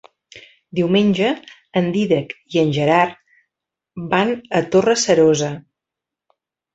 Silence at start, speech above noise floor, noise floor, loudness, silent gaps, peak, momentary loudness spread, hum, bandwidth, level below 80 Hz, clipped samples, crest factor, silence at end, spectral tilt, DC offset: 0.35 s; 69 dB; -85 dBFS; -18 LUFS; none; -2 dBFS; 12 LU; none; 8.2 kHz; -58 dBFS; under 0.1%; 18 dB; 1.15 s; -5 dB/octave; under 0.1%